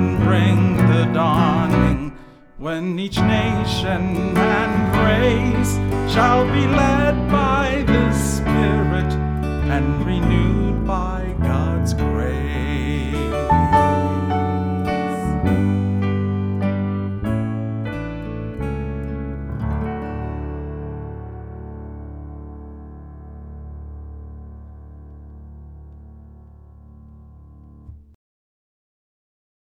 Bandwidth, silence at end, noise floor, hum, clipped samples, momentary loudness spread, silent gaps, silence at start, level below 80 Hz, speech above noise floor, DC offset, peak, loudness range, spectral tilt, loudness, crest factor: 15.5 kHz; 1.7 s; -43 dBFS; none; under 0.1%; 21 LU; none; 0 s; -30 dBFS; 26 dB; under 0.1%; -2 dBFS; 19 LU; -7 dB/octave; -19 LUFS; 18 dB